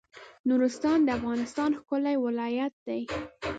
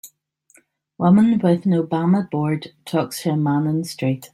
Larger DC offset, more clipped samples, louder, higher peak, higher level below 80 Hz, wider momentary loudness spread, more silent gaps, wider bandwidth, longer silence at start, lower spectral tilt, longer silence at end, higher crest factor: neither; neither; second, -29 LUFS vs -20 LUFS; second, -16 dBFS vs -4 dBFS; about the same, -56 dBFS vs -60 dBFS; about the same, 9 LU vs 9 LU; first, 0.39-0.44 s, 2.73-2.86 s vs none; second, 9 kHz vs 15 kHz; about the same, 0.15 s vs 0.05 s; second, -5.5 dB/octave vs -7.5 dB/octave; about the same, 0 s vs 0.05 s; about the same, 14 dB vs 16 dB